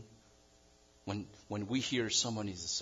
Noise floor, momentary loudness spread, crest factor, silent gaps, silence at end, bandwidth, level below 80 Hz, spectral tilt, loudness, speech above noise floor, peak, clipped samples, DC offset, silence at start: -65 dBFS; 12 LU; 18 dB; none; 0 s; 12 kHz; -70 dBFS; -3 dB/octave; -36 LUFS; 28 dB; -20 dBFS; under 0.1%; under 0.1%; 0 s